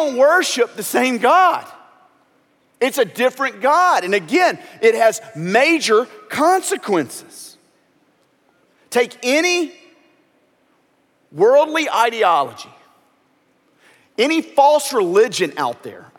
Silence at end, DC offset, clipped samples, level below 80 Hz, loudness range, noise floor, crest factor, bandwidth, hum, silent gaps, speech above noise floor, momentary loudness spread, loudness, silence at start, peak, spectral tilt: 0.2 s; under 0.1%; under 0.1%; -76 dBFS; 6 LU; -60 dBFS; 18 dB; 17 kHz; none; none; 44 dB; 12 LU; -16 LUFS; 0 s; 0 dBFS; -3 dB/octave